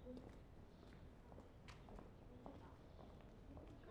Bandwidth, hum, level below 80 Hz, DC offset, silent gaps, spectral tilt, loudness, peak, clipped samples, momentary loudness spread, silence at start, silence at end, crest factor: 10 kHz; none; -64 dBFS; under 0.1%; none; -7 dB/octave; -62 LUFS; -40 dBFS; under 0.1%; 4 LU; 0 s; 0 s; 18 dB